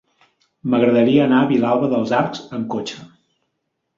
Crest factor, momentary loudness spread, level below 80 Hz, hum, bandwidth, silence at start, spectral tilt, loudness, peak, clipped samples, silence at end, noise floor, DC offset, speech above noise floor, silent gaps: 16 dB; 14 LU; -60 dBFS; none; 7.4 kHz; 0.65 s; -7 dB/octave; -17 LUFS; -2 dBFS; under 0.1%; 0.9 s; -74 dBFS; under 0.1%; 57 dB; none